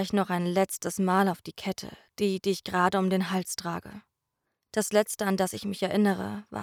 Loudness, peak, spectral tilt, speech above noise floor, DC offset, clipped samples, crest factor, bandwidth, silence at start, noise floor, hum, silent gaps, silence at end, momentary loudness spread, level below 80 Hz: -28 LUFS; -10 dBFS; -5 dB/octave; 54 dB; under 0.1%; under 0.1%; 18 dB; 19 kHz; 0 s; -82 dBFS; none; none; 0 s; 10 LU; -66 dBFS